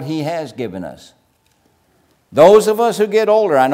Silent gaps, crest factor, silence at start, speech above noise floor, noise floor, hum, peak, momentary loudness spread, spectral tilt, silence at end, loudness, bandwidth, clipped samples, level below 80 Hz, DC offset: none; 14 dB; 0 s; 45 dB; -59 dBFS; none; 0 dBFS; 17 LU; -5.5 dB/octave; 0 s; -13 LUFS; 16 kHz; under 0.1%; -58 dBFS; under 0.1%